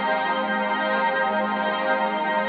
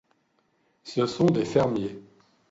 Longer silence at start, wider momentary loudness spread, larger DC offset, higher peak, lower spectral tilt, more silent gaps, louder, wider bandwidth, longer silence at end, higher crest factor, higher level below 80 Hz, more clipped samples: second, 0 s vs 0.85 s; second, 2 LU vs 19 LU; neither; about the same, -10 dBFS vs -8 dBFS; about the same, -7.5 dB/octave vs -7 dB/octave; neither; first, -23 LUFS vs -26 LUFS; second, 5.2 kHz vs 8 kHz; second, 0 s vs 0.5 s; second, 12 dB vs 18 dB; second, -80 dBFS vs -60 dBFS; neither